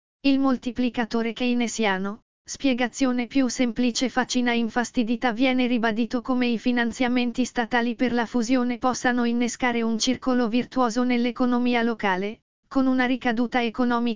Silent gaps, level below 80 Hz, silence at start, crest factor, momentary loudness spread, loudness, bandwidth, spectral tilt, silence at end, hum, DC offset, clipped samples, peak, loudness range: 2.22-2.45 s, 12.42-12.63 s; -54 dBFS; 0.2 s; 16 dB; 4 LU; -24 LUFS; 7.6 kHz; -4 dB/octave; 0 s; none; 1%; under 0.1%; -6 dBFS; 1 LU